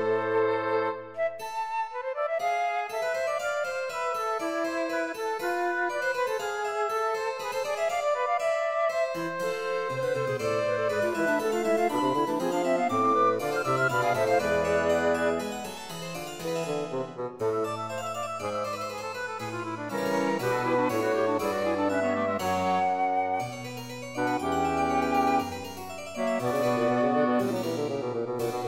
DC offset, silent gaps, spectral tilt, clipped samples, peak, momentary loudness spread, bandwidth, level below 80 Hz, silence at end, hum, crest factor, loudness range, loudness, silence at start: under 0.1%; none; -5 dB/octave; under 0.1%; -12 dBFS; 9 LU; 16 kHz; -62 dBFS; 0 s; none; 16 dB; 5 LU; -28 LUFS; 0 s